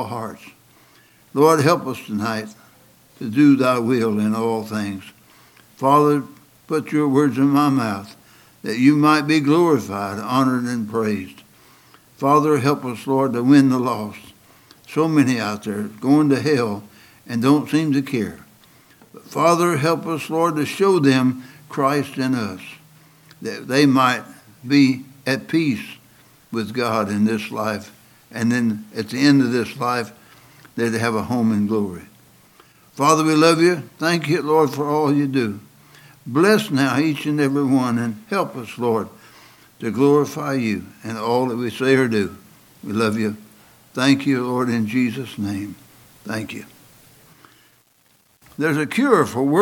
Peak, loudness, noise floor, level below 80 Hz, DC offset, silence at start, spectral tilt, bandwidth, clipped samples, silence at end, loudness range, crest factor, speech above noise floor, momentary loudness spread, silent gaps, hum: 0 dBFS; -19 LUFS; -59 dBFS; -66 dBFS; under 0.1%; 0 s; -6 dB/octave; 17 kHz; under 0.1%; 0 s; 4 LU; 20 dB; 40 dB; 14 LU; none; none